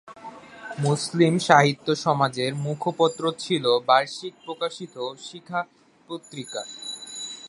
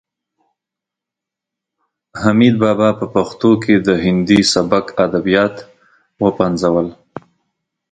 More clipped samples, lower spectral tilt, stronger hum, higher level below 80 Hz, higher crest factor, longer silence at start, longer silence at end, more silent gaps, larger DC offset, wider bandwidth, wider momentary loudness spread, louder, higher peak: neither; about the same, -5 dB/octave vs -5.5 dB/octave; neither; second, -70 dBFS vs -46 dBFS; first, 24 dB vs 16 dB; second, 0.05 s vs 2.15 s; second, 0 s vs 0.7 s; neither; neither; first, 11.5 kHz vs 9.4 kHz; first, 20 LU vs 13 LU; second, -24 LUFS vs -14 LUFS; about the same, 0 dBFS vs 0 dBFS